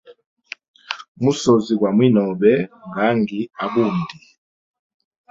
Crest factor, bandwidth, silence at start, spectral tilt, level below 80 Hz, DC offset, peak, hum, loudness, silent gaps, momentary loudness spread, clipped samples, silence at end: 18 dB; 7.8 kHz; 0.1 s; -6.5 dB/octave; -60 dBFS; under 0.1%; -2 dBFS; none; -18 LUFS; 0.26-0.37 s, 0.68-0.74 s, 1.08-1.15 s; 17 LU; under 0.1%; 1.2 s